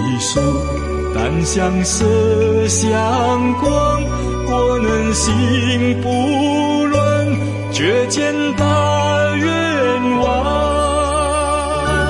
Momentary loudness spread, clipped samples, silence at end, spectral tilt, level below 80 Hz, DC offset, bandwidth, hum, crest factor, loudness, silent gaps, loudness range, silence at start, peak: 4 LU; under 0.1%; 0 s; -5 dB/octave; -28 dBFS; under 0.1%; 11.5 kHz; none; 12 dB; -16 LUFS; none; 1 LU; 0 s; -4 dBFS